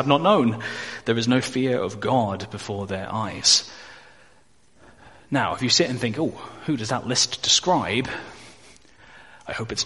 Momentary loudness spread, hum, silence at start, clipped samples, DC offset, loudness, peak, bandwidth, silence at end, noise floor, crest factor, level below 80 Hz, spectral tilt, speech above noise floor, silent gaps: 14 LU; none; 0 s; under 0.1%; 0.2%; -22 LUFS; -4 dBFS; 11.5 kHz; 0 s; -59 dBFS; 20 dB; -58 dBFS; -3.5 dB/octave; 36 dB; none